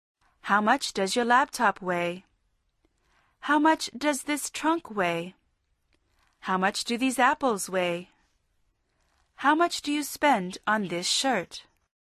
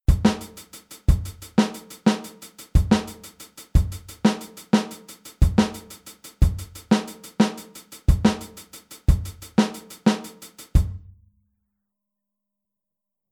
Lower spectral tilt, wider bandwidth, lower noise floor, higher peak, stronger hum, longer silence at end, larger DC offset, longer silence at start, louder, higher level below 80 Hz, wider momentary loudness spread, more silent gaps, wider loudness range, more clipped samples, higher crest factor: second, -3 dB/octave vs -6 dB/octave; second, 13.5 kHz vs 19 kHz; second, -73 dBFS vs -85 dBFS; second, -8 dBFS vs -4 dBFS; neither; second, 0.45 s vs 2.35 s; neither; first, 0.45 s vs 0.1 s; about the same, -26 LUFS vs -24 LUFS; second, -68 dBFS vs -28 dBFS; second, 11 LU vs 21 LU; neither; about the same, 2 LU vs 3 LU; neither; about the same, 20 dB vs 20 dB